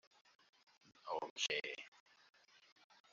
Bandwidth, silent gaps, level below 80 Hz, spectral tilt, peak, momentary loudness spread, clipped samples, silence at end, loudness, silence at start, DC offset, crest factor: 7.6 kHz; 1.30-1.36 s, 1.88-1.92 s; under -90 dBFS; 2 dB/octave; -26 dBFS; 18 LU; under 0.1%; 1.15 s; -43 LUFS; 0.85 s; under 0.1%; 24 dB